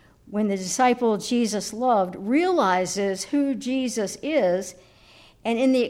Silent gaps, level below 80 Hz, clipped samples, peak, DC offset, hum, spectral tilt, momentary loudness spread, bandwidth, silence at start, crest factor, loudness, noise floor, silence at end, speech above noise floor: none; -62 dBFS; under 0.1%; -8 dBFS; under 0.1%; none; -4 dB/octave; 7 LU; 16 kHz; 0.3 s; 16 dB; -24 LUFS; -52 dBFS; 0 s; 30 dB